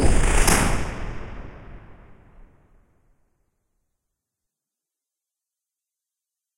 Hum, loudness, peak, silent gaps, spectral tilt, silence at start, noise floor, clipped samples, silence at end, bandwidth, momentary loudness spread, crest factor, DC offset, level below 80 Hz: none; -22 LUFS; -2 dBFS; none; -4 dB/octave; 0 s; -87 dBFS; under 0.1%; 4.8 s; 16 kHz; 25 LU; 22 dB; under 0.1%; -28 dBFS